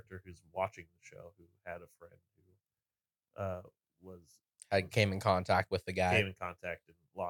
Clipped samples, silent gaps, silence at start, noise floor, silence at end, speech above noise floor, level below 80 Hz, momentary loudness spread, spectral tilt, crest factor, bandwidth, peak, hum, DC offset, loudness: under 0.1%; none; 0.1 s; under -90 dBFS; 0 s; over 54 dB; -66 dBFS; 25 LU; -5.5 dB/octave; 24 dB; 19 kHz; -12 dBFS; none; under 0.1%; -34 LUFS